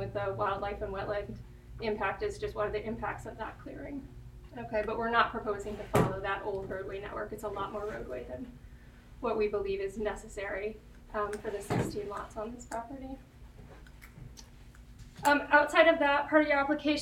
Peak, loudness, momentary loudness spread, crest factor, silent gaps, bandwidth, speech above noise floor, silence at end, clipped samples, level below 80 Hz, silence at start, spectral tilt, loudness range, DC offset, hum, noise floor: -10 dBFS; -32 LUFS; 23 LU; 24 dB; none; 16.5 kHz; 20 dB; 0 s; under 0.1%; -52 dBFS; 0 s; -5.5 dB/octave; 9 LU; under 0.1%; none; -52 dBFS